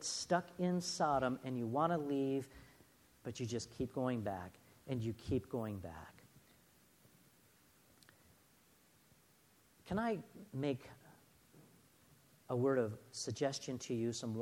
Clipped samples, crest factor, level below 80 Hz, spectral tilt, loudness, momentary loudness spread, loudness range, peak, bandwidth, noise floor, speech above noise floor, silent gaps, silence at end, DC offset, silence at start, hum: under 0.1%; 22 dB; -68 dBFS; -5.5 dB/octave; -40 LUFS; 16 LU; 9 LU; -20 dBFS; 17 kHz; -70 dBFS; 31 dB; none; 0 s; under 0.1%; 0 s; none